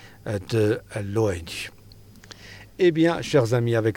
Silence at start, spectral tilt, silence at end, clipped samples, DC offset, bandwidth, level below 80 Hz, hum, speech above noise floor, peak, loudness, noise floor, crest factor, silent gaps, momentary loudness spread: 0 s; -6.5 dB/octave; 0 s; under 0.1%; under 0.1%; 17.5 kHz; -54 dBFS; none; 25 dB; -8 dBFS; -23 LUFS; -47 dBFS; 16 dB; none; 22 LU